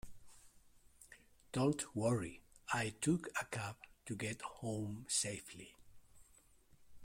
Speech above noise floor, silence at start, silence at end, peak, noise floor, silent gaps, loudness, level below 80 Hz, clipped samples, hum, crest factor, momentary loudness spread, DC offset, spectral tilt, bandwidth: 28 dB; 0.05 s; 0 s; -24 dBFS; -68 dBFS; none; -40 LUFS; -66 dBFS; under 0.1%; none; 20 dB; 19 LU; under 0.1%; -4.5 dB/octave; 16.5 kHz